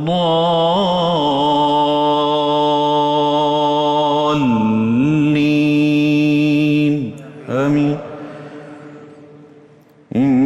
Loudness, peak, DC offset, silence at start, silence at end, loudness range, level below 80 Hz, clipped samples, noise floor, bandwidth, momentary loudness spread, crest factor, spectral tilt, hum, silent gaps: -15 LUFS; -6 dBFS; under 0.1%; 0 s; 0 s; 6 LU; -54 dBFS; under 0.1%; -46 dBFS; 8.4 kHz; 12 LU; 8 dB; -7 dB/octave; none; none